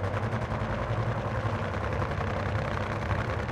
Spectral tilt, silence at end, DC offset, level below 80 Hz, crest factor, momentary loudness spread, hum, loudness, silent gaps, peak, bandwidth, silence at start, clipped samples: -7 dB/octave; 0 s; under 0.1%; -40 dBFS; 14 dB; 1 LU; none; -31 LUFS; none; -16 dBFS; 9.8 kHz; 0 s; under 0.1%